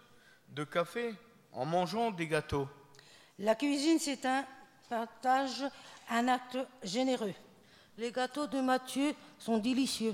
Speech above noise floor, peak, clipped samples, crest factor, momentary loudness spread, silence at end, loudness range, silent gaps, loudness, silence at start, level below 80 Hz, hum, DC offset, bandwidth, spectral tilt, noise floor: 28 dB; -16 dBFS; under 0.1%; 18 dB; 11 LU; 0 s; 2 LU; none; -34 LUFS; 0.5 s; -68 dBFS; none; under 0.1%; 16.5 kHz; -4.5 dB/octave; -61 dBFS